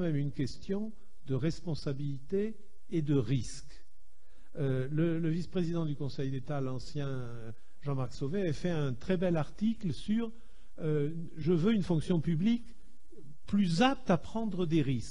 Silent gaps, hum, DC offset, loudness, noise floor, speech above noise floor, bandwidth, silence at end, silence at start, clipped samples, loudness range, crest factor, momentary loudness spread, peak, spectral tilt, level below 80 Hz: none; none; 1%; -33 LUFS; -61 dBFS; 29 dB; 10.5 kHz; 0 s; 0 s; under 0.1%; 5 LU; 18 dB; 9 LU; -14 dBFS; -7.5 dB/octave; -54 dBFS